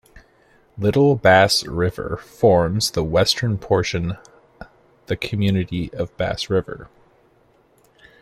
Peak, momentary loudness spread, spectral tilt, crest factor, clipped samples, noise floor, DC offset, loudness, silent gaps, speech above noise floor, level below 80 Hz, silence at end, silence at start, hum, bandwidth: -2 dBFS; 15 LU; -5 dB/octave; 20 dB; under 0.1%; -57 dBFS; under 0.1%; -19 LUFS; none; 38 dB; -44 dBFS; 1.35 s; 0.15 s; none; 15 kHz